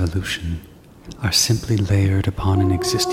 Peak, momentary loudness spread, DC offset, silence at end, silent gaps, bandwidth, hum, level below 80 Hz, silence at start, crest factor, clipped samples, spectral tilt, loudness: -4 dBFS; 10 LU; under 0.1%; 0 s; none; 16 kHz; none; -36 dBFS; 0 s; 16 dB; under 0.1%; -4.5 dB/octave; -19 LUFS